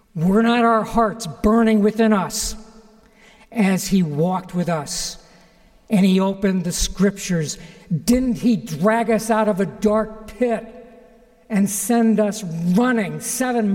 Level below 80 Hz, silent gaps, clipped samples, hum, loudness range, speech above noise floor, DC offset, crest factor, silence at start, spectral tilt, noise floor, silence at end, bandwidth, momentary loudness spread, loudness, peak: -40 dBFS; none; under 0.1%; none; 2 LU; 33 dB; under 0.1%; 14 dB; 0.15 s; -5.5 dB/octave; -51 dBFS; 0 s; 17 kHz; 9 LU; -19 LUFS; -6 dBFS